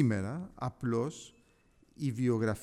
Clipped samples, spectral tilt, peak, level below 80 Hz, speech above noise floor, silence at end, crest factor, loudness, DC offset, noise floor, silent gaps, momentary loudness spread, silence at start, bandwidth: under 0.1%; -7.5 dB/octave; -16 dBFS; -62 dBFS; 34 dB; 0 s; 18 dB; -34 LUFS; under 0.1%; -66 dBFS; none; 11 LU; 0 s; 13 kHz